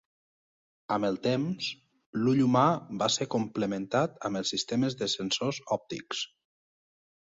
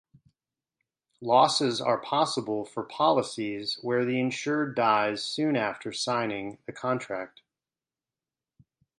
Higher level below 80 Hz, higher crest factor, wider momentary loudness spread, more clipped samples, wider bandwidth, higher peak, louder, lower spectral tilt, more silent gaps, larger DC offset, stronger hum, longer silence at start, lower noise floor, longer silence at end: first, -68 dBFS vs -74 dBFS; about the same, 22 dB vs 22 dB; about the same, 11 LU vs 12 LU; neither; second, 7.8 kHz vs 11 kHz; second, -10 dBFS vs -6 dBFS; about the same, -29 LUFS vs -27 LUFS; about the same, -4.5 dB/octave vs -4 dB/octave; first, 2.06-2.13 s vs none; neither; neither; second, 0.9 s vs 1.2 s; about the same, under -90 dBFS vs under -90 dBFS; second, 1.05 s vs 1.7 s